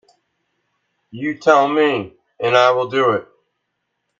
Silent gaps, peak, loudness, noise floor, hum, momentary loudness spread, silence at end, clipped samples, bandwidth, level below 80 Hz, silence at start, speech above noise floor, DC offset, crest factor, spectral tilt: none; 0 dBFS; -17 LUFS; -74 dBFS; none; 12 LU; 0.95 s; under 0.1%; 7.4 kHz; -68 dBFS; 1.15 s; 58 dB; under 0.1%; 20 dB; -5 dB/octave